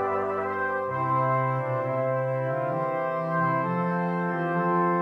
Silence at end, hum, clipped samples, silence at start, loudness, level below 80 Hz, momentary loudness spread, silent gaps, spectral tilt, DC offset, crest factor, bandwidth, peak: 0 s; none; under 0.1%; 0 s; -26 LUFS; -72 dBFS; 4 LU; none; -9.5 dB/octave; under 0.1%; 12 dB; 5.6 kHz; -14 dBFS